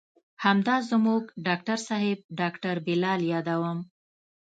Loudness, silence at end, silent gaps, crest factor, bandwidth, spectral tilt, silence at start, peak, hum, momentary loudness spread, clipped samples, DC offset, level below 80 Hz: -27 LUFS; 0.55 s; 2.24-2.29 s; 20 dB; 9 kHz; -6 dB/octave; 0.4 s; -8 dBFS; none; 7 LU; under 0.1%; under 0.1%; -74 dBFS